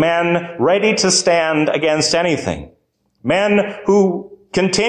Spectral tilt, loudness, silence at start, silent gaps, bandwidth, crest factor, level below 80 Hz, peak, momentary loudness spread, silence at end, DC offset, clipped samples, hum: -3.5 dB/octave; -16 LUFS; 0 s; none; 10 kHz; 12 dB; -48 dBFS; -4 dBFS; 10 LU; 0 s; under 0.1%; under 0.1%; none